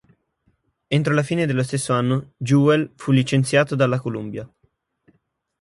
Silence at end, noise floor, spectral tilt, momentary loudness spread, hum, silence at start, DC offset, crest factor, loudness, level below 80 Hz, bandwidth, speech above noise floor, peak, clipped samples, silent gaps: 1.15 s; -67 dBFS; -6 dB/octave; 8 LU; none; 0.9 s; under 0.1%; 18 dB; -20 LUFS; -60 dBFS; 11.5 kHz; 48 dB; -4 dBFS; under 0.1%; none